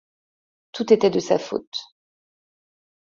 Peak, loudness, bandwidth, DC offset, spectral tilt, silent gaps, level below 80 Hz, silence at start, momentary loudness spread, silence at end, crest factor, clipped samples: -4 dBFS; -21 LUFS; 7.6 kHz; under 0.1%; -5 dB/octave; 1.67-1.72 s; -66 dBFS; 0.75 s; 15 LU; 1.2 s; 22 dB; under 0.1%